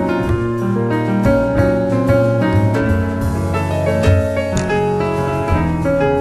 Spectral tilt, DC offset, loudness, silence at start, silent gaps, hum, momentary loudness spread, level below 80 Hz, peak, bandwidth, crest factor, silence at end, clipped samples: -7.5 dB/octave; under 0.1%; -16 LUFS; 0 s; none; none; 4 LU; -30 dBFS; -2 dBFS; 13 kHz; 14 dB; 0 s; under 0.1%